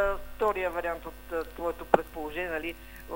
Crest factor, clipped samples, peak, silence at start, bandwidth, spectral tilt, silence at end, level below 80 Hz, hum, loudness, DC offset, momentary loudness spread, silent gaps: 28 dB; under 0.1%; -2 dBFS; 0 s; 16 kHz; -5.5 dB/octave; 0 s; -46 dBFS; none; -31 LUFS; under 0.1%; 10 LU; none